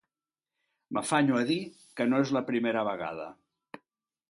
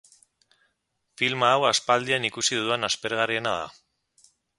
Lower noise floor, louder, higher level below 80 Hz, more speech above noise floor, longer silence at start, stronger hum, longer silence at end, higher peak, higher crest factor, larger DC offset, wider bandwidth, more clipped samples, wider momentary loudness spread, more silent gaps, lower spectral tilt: first, under -90 dBFS vs -76 dBFS; second, -29 LUFS vs -24 LUFS; second, -74 dBFS vs -66 dBFS; first, over 62 dB vs 51 dB; second, 0.9 s vs 1.2 s; neither; first, 1 s vs 0.85 s; second, -12 dBFS vs -6 dBFS; about the same, 20 dB vs 22 dB; neither; about the same, 11.5 kHz vs 11.5 kHz; neither; first, 13 LU vs 7 LU; neither; first, -5 dB/octave vs -2 dB/octave